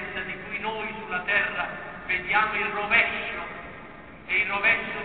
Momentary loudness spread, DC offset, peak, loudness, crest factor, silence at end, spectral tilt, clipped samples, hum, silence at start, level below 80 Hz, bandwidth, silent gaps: 17 LU; 0.2%; -8 dBFS; -25 LUFS; 20 dB; 0 s; -7 dB/octave; under 0.1%; none; 0 s; -54 dBFS; 4.6 kHz; none